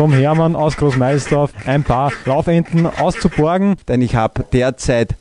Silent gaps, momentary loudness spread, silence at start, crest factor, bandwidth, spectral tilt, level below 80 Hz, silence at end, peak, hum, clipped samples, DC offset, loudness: none; 3 LU; 0 s; 14 dB; 11 kHz; -7 dB/octave; -32 dBFS; 0.05 s; 0 dBFS; none; under 0.1%; under 0.1%; -15 LUFS